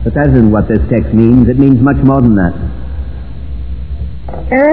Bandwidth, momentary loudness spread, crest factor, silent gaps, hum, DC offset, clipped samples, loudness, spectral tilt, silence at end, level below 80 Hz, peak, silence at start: 4.5 kHz; 16 LU; 10 dB; none; none; 4%; 2%; -9 LUFS; -12.5 dB/octave; 0 s; -20 dBFS; 0 dBFS; 0 s